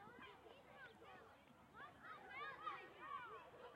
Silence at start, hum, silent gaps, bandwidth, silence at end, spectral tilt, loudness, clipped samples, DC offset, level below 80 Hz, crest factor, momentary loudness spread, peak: 0 s; none; none; 16 kHz; 0 s; -4.5 dB/octave; -56 LUFS; under 0.1%; under 0.1%; -84 dBFS; 20 dB; 12 LU; -38 dBFS